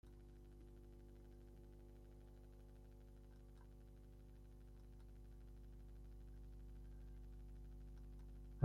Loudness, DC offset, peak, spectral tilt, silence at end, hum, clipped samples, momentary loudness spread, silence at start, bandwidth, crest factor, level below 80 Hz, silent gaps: -62 LUFS; under 0.1%; -22 dBFS; -8 dB/octave; 0 s; 50 Hz at -60 dBFS; under 0.1%; 4 LU; 0.05 s; 15.5 kHz; 32 dB; -60 dBFS; none